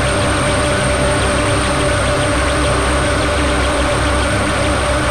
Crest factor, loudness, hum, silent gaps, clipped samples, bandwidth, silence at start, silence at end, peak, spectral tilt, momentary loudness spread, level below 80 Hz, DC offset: 10 dB; -15 LUFS; none; none; under 0.1%; 13.5 kHz; 0 s; 0 s; -4 dBFS; -4 dB/octave; 1 LU; -22 dBFS; under 0.1%